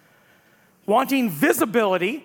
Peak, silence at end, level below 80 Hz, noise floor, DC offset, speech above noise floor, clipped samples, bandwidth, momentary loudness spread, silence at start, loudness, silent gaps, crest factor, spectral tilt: -4 dBFS; 0.05 s; -72 dBFS; -57 dBFS; under 0.1%; 37 dB; under 0.1%; 18 kHz; 3 LU; 0.9 s; -20 LUFS; none; 18 dB; -4.5 dB/octave